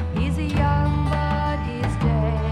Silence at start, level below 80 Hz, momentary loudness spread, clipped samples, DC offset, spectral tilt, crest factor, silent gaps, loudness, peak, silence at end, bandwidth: 0 s; -28 dBFS; 5 LU; under 0.1%; under 0.1%; -8 dB/octave; 14 dB; none; -22 LUFS; -8 dBFS; 0 s; 11 kHz